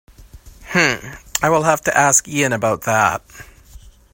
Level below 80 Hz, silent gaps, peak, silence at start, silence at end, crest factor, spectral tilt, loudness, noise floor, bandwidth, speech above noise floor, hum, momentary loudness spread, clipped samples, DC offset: -46 dBFS; none; 0 dBFS; 0.2 s; 0.25 s; 18 dB; -3 dB/octave; -16 LUFS; -43 dBFS; 16.5 kHz; 26 dB; none; 9 LU; under 0.1%; under 0.1%